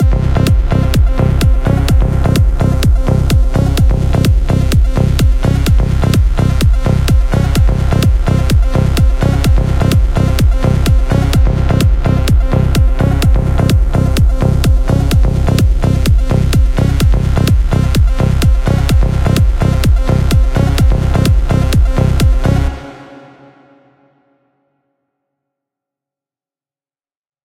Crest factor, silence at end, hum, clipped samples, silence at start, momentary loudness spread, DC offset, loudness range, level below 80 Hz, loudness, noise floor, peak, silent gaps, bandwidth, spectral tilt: 10 dB; 4.3 s; none; under 0.1%; 0 s; 1 LU; under 0.1%; 1 LU; -12 dBFS; -12 LUFS; under -90 dBFS; 0 dBFS; none; 16.5 kHz; -7 dB/octave